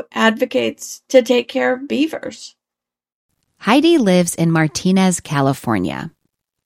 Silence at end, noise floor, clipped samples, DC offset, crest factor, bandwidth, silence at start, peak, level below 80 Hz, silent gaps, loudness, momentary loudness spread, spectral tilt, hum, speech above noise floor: 0.55 s; -87 dBFS; under 0.1%; under 0.1%; 18 dB; 16.5 kHz; 0 s; 0 dBFS; -56 dBFS; 3.12-3.29 s; -16 LUFS; 15 LU; -5 dB/octave; none; 71 dB